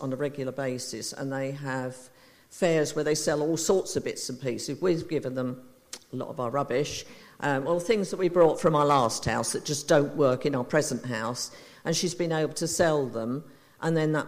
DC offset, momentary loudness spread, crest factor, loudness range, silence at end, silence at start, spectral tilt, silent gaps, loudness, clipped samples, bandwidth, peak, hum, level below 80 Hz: under 0.1%; 12 LU; 18 dB; 6 LU; 0 s; 0 s; -4.5 dB/octave; none; -27 LUFS; under 0.1%; 15.5 kHz; -8 dBFS; none; -58 dBFS